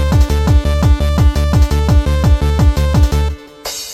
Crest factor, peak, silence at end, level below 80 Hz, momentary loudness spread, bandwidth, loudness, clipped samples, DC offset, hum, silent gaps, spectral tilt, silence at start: 10 dB; 0 dBFS; 0 s; -14 dBFS; 7 LU; 15 kHz; -13 LUFS; under 0.1%; under 0.1%; none; none; -6.5 dB/octave; 0 s